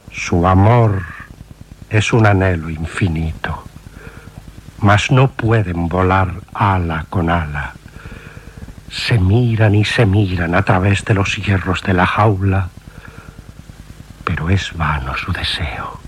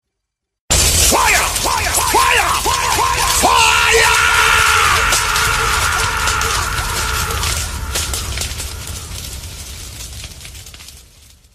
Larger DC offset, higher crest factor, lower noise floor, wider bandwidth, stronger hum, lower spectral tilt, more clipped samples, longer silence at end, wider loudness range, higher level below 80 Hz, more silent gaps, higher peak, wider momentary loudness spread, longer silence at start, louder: neither; about the same, 16 dB vs 16 dB; second, -37 dBFS vs -77 dBFS; second, 11.5 kHz vs 15.5 kHz; neither; first, -6.5 dB/octave vs -1.5 dB/octave; neither; second, 0 s vs 0.55 s; second, 5 LU vs 13 LU; second, -36 dBFS vs -28 dBFS; neither; about the same, 0 dBFS vs 0 dBFS; first, 23 LU vs 19 LU; second, 0.05 s vs 0.7 s; second, -16 LUFS vs -13 LUFS